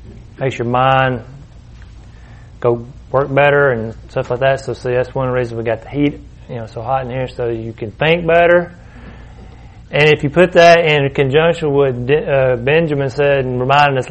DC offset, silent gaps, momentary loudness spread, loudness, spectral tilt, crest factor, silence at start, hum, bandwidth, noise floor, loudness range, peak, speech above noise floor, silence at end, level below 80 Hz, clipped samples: under 0.1%; none; 12 LU; -14 LUFS; -6.5 dB/octave; 16 dB; 0 s; none; 8.6 kHz; -37 dBFS; 7 LU; 0 dBFS; 23 dB; 0 s; -38 dBFS; under 0.1%